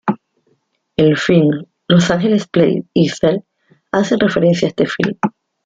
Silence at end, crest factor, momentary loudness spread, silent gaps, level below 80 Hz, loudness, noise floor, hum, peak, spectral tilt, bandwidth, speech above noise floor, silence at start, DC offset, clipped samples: 0.35 s; 16 dB; 10 LU; none; -50 dBFS; -15 LUFS; -62 dBFS; none; 0 dBFS; -6.5 dB/octave; 7.8 kHz; 49 dB; 0.05 s; under 0.1%; under 0.1%